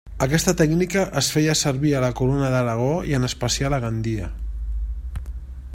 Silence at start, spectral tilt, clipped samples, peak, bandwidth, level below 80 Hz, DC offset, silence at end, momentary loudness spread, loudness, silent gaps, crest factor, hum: 0.05 s; -5 dB/octave; under 0.1%; -2 dBFS; 16 kHz; -32 dBFS; under 0.1%; 0 s; 13 LU; -22 LUFS; none; 20 dB; none